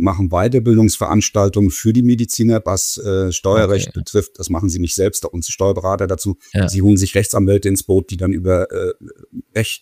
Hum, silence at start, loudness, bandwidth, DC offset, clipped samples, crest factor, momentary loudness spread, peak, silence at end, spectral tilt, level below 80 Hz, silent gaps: none; 0 s; -16 LUFS; 15.5 kHz; under 0.1%; under 0.1%; 14 dB; 8 LU; 0 dBFS; 0.05 s; -5.5 dB/octave; -36 dBFS; none